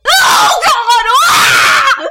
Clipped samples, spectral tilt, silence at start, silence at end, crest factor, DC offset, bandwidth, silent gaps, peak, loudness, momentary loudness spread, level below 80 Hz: under 0.1%; 0.5 dB/octave; 0.05 s; 0 s; 8 dB; under 0.1%; 17 kHz; none; 0 dBFS; -7 LUFS; 3 LU; -44 dBFS